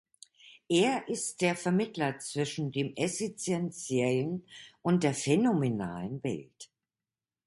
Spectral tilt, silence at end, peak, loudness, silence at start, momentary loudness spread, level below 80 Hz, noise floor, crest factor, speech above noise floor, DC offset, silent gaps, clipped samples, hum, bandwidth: -5 dB/octave; 0.8 s; -12 dBFS; -31 LUFS; 0.45 s; 10 LU; -68 dBFS; under -90 dBFS; 18 dB; over 60 dB; under 0.1%; none; under 0.1%; none; 11.5 kHz